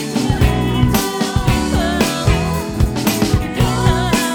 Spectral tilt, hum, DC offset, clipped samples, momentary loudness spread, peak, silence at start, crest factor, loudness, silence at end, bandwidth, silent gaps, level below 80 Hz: -5 dB/octave; none; under 0.1%; under 0.1%; 3 LU; 0 dBFS; 0 s; 14 dB; -16 LUFS; 0 s; 19 kHz; none; -24 dBFS